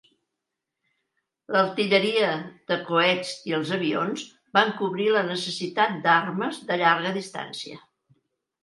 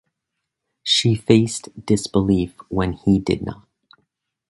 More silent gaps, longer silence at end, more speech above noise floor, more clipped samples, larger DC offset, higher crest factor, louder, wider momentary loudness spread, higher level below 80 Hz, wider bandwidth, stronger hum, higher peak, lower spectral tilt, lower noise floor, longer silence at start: neither; about the same, 0.85 s vs 0.95 s; about the same, 60 dB vs 61 dB; neither; neither; about the same, 22 dB vs 20 dB; second, -24 LUFS vs -19 LUFS; about the same, 11 LU vs 9 LU; second, -76 dBFS vs -42 dBFS; about the same, 11.5 kHz vs 11.5 kHz; neither; second, -4 dBFS vs 0 dBFS; about the same, -4.5 dB/octave vs -5.5 dB/octave; first, -84 dBFS vs -80 dBFS; first, 1.5 s vs 0.85 s